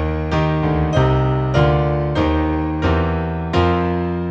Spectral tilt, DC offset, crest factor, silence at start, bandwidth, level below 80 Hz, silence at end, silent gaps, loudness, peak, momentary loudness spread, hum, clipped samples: -8 dB/octave; under 0.1%; 14 dB; 0 s; 7.4 kHz; -26 dBFS; 0 s; none; -18 LUFS; -4 dBFS; 4 LU; none; under 0.1%